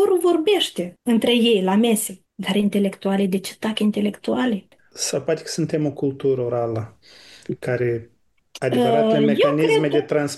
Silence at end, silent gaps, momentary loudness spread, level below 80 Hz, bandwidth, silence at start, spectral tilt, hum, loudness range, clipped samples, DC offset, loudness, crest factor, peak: 0 s; none; 10 LU; -64 dBFS; 12.5 kHz; 0 s; -5 dB/octave; none; 5 LU; under 0.1%; under 0.1%; -21 LUFS; 14 dB; -6 dBFS